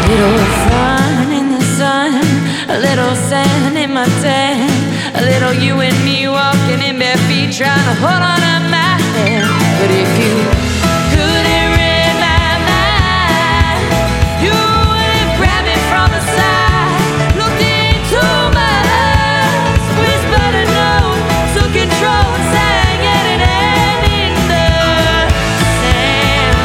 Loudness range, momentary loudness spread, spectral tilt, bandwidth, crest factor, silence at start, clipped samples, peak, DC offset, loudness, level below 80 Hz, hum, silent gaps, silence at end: 1 LU; 2 LU; -4.5 dB/octave; 17 kHz; 12 dB; 0 s; under 0.1%; 0 dBFS; under 0.1%; -11 LUFS; -22 dBFS; none; none; 0 s